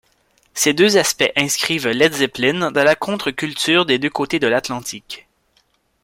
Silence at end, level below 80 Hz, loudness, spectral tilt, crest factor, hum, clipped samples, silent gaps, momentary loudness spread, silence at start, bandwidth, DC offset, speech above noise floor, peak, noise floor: 0.85 s; -56 dBFS; -17 LUFS; -3 dB/octave; 18 dB; none; under 0.1%; none; 13 LU; 0.55 s; 16.5 kHz; under 0.1%; 44 dB; 0 dBFS; -62 dBFS